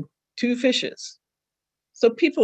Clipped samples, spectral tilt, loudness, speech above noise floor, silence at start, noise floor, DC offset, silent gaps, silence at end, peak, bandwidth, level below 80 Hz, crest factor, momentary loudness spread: under 0.1%; -3.5 dB/octave; -23 LUFS; 65 dB; 0 s; -86 dBFS; under 0.1%; none; 0 s; -6 dBFS; 8.8 kHz; -76 dBFS; 18 dB; 18 LU